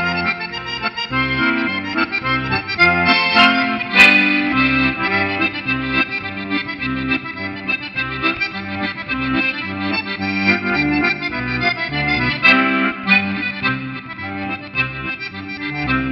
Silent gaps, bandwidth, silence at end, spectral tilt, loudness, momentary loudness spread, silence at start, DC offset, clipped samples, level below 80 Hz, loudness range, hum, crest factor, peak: none; 13.5 kHz; 0 s; -5.5 dB/octave; -17 LUFS; 12 LU; 0 s; under 0.1%; under 0.1%; -42 dBFS; 7 LU; none; 18 dB; 0 dBFS